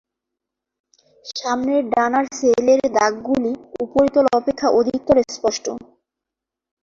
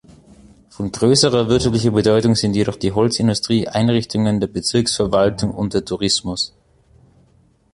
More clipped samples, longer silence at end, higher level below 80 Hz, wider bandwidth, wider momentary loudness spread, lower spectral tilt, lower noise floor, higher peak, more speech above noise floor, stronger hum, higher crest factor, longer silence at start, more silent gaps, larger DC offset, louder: neither; second, 1 s vs 1.25 s; second, -52 dBFS vs -42 dBFS; second, 7.6 kHz vs 11.5 kHz; first, 11 LU vs 7 LU; about the same, -4 dB/octave vs -5 dB/octave; first, -85 dBFS vs -55 dBFS; about the same, -2 dBFS vs -2 dBFS; first, 67 dB vs 38 dB; neither; about the same, 18 dB vs 16 dB; first, 1.25 s vs 0.8 s; neither; neither; about the same, -18 LUFS vs -17 LUFS